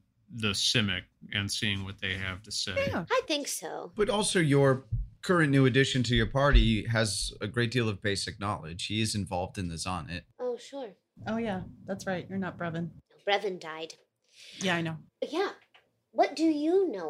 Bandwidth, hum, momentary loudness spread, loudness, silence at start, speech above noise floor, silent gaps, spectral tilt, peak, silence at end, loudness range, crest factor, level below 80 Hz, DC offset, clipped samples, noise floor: 15.5 kHz; none; 14 LU; -29 LUFS; 0.3 s; 36 dB; none; -4.5 dB/octave; -8 dBFS; 0 s; 9 LU; 22 dB; -40 dBFS; under 0.1%; under 0.1%; -65 dBFS